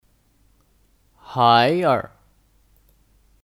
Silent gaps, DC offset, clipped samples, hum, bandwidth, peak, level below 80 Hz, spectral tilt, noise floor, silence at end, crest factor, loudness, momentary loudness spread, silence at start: none; under 0.1%; under 0.1%; none; 16.5 kHz; -2 dBFS; -60 dBFS; -6.5 dB/octave; -60 dBFS; 1.4 s; 22 dB; -18 LUFS; 16 LU; 1.3 s